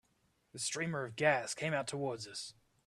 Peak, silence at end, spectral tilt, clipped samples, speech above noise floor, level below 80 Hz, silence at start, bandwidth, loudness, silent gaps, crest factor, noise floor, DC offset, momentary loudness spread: -14 dBFS; 0.35 s; -3.5 dB/octave; under 0.1%; 39 dB; -76 dBFS; 0.55 s; 13.5 kHz; -36 LUFS; none; 24 dB; -76 dBFS; under 0.1%; 13 LU